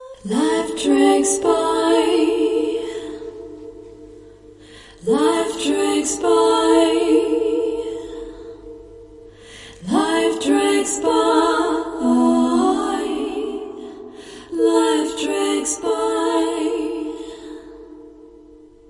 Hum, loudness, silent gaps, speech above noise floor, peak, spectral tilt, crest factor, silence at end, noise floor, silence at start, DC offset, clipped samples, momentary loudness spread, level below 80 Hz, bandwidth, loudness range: none; -18 LUFS; none; 29 dB; -4 dBFS; -3 dB/octave; 16 dB; 0.6 s; -45 dBFS; 0 s; under 0.1%; under 0.1%; 21 LU; -52 dBFS; 11.5 kHz; 6 LU